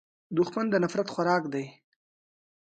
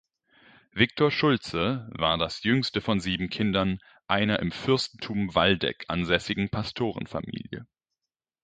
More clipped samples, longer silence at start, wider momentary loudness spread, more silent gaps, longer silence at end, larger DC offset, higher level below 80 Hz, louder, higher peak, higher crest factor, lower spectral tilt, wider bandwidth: neither; second, 0.3 s vs 0.75 s; about the same, 9 LU vs 11 LU; neither; first, 1.1 s vs 0.8 s; neither; second, -74 dBFS vs -50 dBFS; about the same, -28 LUFS vs -26 LUFS; second, -12 dBFS vs -4 dBFS; about the same, 18 dB vs 22 dB; about the same, -6.5 dB/octave vs -6 dB/octave; about the same, 9 kHz vs 9.2 kHz